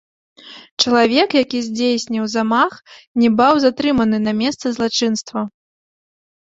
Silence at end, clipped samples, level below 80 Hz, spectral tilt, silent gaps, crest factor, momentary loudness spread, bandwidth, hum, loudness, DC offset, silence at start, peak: 1.1 s; under 0.1%; -54 dBFS; -4 dB/octave; 0.71-0.77 s, 3.07-3.15 s; 18 dB; 10 LU; 7.8 kHz; none; -17 LUFS; under 0.1%; 0.45 s; 0 dBFS